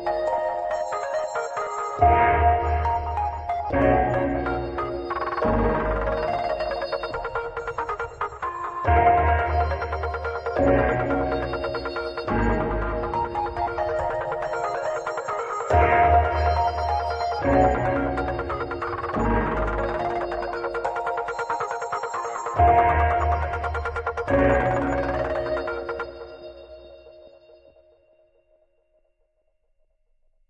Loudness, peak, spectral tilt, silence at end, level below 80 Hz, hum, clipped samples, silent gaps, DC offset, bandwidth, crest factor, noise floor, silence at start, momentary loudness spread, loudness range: -24 LUFS; -6 dBFS; -7 dB/octave; 3.2 s; -36 dBFS; none; under 0.1%; none; under 0.1%; 8.2 kHz; 18 dB; -68 dBFS; 0 s; 10 LU; 5 LU